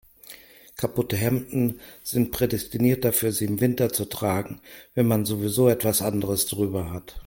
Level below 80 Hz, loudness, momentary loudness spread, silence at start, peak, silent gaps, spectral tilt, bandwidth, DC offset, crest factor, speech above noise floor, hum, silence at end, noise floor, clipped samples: -50 dBFS; -24 LUFS; 15 LU; 0.3 s; -6 dBFS; none; -5.5 dB/octave; 17 kHz; under 0.1%; 18 dB; 23 dB; none; 0.05 s; -47 dBFS; under 0.1%